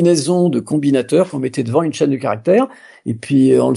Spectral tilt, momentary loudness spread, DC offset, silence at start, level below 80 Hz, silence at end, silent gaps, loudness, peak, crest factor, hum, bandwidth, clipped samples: -6.5 dB/octave; 9 LU; under 0.1%; 0 s; -62 dBFS; 0 s; none; -16 LUFS; -2 dBFS; 12 dB; none; 11.5 kHz; under 0.1%